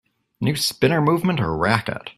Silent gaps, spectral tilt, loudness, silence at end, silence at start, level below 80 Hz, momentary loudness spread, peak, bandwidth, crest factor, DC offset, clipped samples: none; -5 dB/octave; -20 LUFS; 0.05 s; 0.4 s; -48 dBFS; 5 LU; 0 dBFS; 15.5 kHz; 20 dB; under 0.1%; under 0.1%